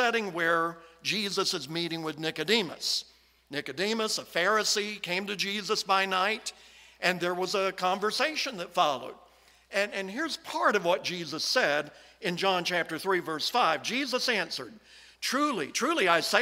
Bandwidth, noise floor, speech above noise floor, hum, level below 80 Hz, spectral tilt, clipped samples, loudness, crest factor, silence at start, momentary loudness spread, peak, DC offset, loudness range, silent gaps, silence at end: 16 kHz; -59 dBFS; 30 dB; none; -72 dBFS; -2.5 dB/octave; under 0.1%; -28 LUFS; 24 dB; 0 s; 9 LU; -6 dBFS; under 0.1%; 2 LU; none; 0 s